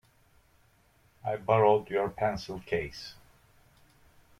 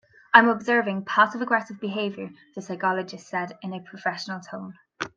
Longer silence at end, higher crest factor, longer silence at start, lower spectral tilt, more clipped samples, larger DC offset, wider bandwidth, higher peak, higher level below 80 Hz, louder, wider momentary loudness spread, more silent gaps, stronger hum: first, 1.25 s vs 0.1 s; about the same, 22 dB vs 24 dB; first, 1.25 s vs 0.35 s; first, -6.5 dB/octave vs -5 dB/octave; neither; neither; first, 14 kHz vs 7.8 kHz; second, -10 dBFS vs 0 dBFS; first, -58 dBFS vs -74 dBFS; second, -29 LUFS vs -23 LUFS; second, 17 LU vs 21 LU; neither; neither